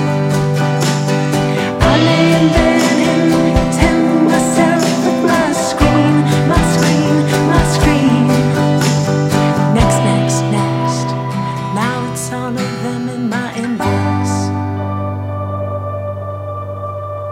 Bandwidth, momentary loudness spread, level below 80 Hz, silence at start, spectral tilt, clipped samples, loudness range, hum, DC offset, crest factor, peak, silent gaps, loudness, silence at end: 16.5 kHz; 10 LU; -28 dBFS; 0 s; -5.5 dB/octave; under 0.1%; 7 LU; none; under 0.1%; 14 dB; 0 dBFS; none; -14 LUFS; 0 s